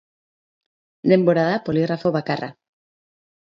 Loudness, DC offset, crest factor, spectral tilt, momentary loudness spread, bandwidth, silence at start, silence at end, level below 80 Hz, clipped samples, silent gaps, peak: -20 LUFS; under 0.1%; 20 dB; -8.5 dB/octave; 11 LU; 7 kHz; 1.05 s; 1.05 s; -62 dBFS; under 0.1%; none; -2 dBFS